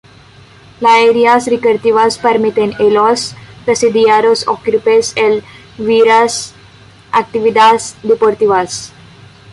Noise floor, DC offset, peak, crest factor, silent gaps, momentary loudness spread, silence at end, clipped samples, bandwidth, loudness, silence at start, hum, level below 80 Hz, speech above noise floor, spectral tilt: -40 dBFS; under 0.1%; 0 dBFS; 12 dB; none; 11 LU; 0.65 s; under 0.1%; 11.5 kHz; -11 LUFS; 0.8 s; none; -52 dBFS; 30 dB; -3.5 dB/octave